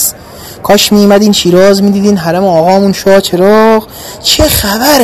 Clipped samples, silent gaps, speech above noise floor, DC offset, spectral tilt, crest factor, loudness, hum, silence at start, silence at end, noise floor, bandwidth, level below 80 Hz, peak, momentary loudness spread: 3%; none; 21 dB; under 0.1%; -4 dB/octave; 6 dB; -7 LUFS; none; 0 s; 0 s; -28 dBFS; 14 kHz; -30 dBFS; 0 dBFS; 8 LU